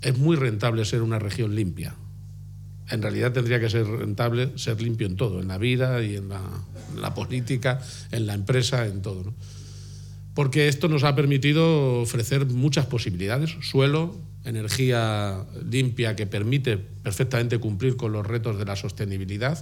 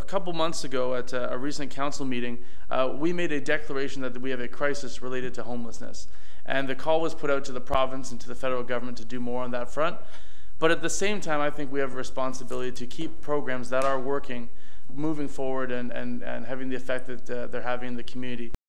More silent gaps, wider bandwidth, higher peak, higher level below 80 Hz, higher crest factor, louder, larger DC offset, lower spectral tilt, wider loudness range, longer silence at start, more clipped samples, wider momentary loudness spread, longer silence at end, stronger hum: neither; about the same, 16.5 kHz vs 15.5 kHz; about the same, -6 dBFS vs -6 dBFS; about the same, -50 dBFS vs -50 dBFS; about the same, 20 dB vs 22 dB; first, -25 LUFS vs -30 LUFS; second, under 0.1% vs 10%; first, -6 dB/octave vs -4.5 dB/octave; about the same, 5 LU vs 3 LU; about the same, 0 s vs 0 s; neither; first, 14 LU vs 10 LU; about the same, 0 s vs 0 s; first, 50 Hz at -45 dBFS vs none